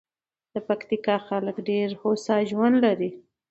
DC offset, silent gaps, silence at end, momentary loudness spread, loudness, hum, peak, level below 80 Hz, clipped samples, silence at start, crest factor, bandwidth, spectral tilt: under 0.1%; none; 0.3 s; 9 LU; -25 LUFS; none; -8 dBFS; -74 dBFS; under 0.1%; 0.55 s; 16 dB; 8.2 kHz; -6.5 dB/octave